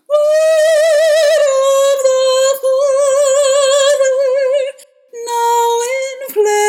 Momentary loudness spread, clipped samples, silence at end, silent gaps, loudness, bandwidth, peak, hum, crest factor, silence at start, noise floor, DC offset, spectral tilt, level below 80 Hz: 7 LU; under 0.1%; 0 s; none; -12 LUFS; 17 kHz; -2 dBFS; none; 10 dB; 0.1 s; -34 dBFS; under 0.1%; 2.5 dB/octave; -84 dBFS